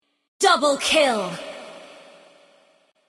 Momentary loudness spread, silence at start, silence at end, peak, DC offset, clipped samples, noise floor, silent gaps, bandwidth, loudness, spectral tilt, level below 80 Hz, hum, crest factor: 20 LU; 0.4 s; 1.15 s; -4 dBFS; under 0.1%; under 0.1%; -60 dBFS; none; 15.5 kHz; -19 LUFS; -2 dB/octave; -62 dBFS; none; 20 dB